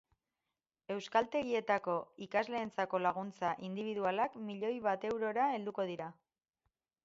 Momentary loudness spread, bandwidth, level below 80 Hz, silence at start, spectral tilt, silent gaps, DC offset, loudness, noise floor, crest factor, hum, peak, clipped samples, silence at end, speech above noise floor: 7 LU; 7.6 kHz; -78 dBFS; 0.9 s; -3.5 dB/octave; none; under 0.1%; -37 LUFS; under -90 dBFS; 20 dB; none; -16 dBFS; under 0.1%; 0.95 s; over 54 dB